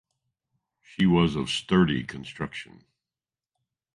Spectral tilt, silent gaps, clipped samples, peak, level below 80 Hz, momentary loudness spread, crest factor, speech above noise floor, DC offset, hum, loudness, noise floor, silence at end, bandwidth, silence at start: -6 dB/octave; none; under 0.1%; -8 dBFS; -52 dBFS; 16 LU; 20 dB; over 65 dB; under 0.1%; none; -25 LUFS; under -90 dBFS; 1.3 s; 11 kHz; 1 s